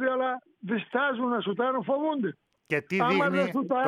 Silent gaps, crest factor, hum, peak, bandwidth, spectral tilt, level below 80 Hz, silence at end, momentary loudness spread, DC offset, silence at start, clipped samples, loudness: none; 16 dB; none; -12 dBFS; 13 kHz; -7 dB/octave; -78 dBFS; 0 s; 8 LU; under 0.1%; 0 s; under 0.1%; -28 LUFS